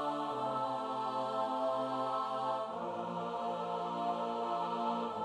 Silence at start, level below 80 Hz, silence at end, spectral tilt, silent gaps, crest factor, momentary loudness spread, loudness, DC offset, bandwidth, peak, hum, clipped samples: 0 s; -84 dBFS; 0 s; -6 dB/octave; none; 14 dB; 3 LU; -36 LUFS; under 0.1%; 11.5 kHz; -24 dBFS; none; under 0.1%